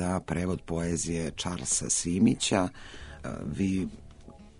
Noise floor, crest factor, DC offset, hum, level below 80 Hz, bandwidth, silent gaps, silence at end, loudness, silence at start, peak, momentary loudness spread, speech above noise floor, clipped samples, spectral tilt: -50 dBFS; 18 dB; under 0.1%; none; -48 dBFS; 11 kHz; none; 0.1 s; -29 LUFS; 0 s; -12 dBFS; 14 LU; 20 dB; under 0.1%; -4 dB/octave